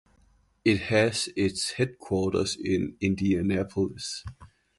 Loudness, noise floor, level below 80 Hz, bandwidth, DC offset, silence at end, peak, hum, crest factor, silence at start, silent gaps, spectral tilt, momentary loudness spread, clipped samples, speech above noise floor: -27 LUFS; -63 dBFS; -48 dBFS; 11.5 kHz; under 0.1%; 0.3 s; -8 dBFS; none; 20 dB; 0.65 s; none; -5 dB/octave; 7 LU; under 0.1%; 37 dB